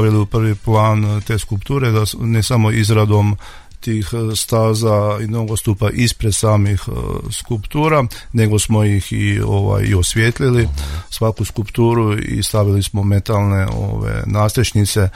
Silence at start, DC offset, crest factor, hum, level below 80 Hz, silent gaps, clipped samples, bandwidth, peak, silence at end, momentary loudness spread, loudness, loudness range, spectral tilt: 0 s; under 0.1%; 14 dB; none; -32 dBFS; none; under 0.1%; 16 kHz; -2 dBFS; 0.05 s; 7 LU; -16 LUFS; 2 LU; -5.5 dB/octave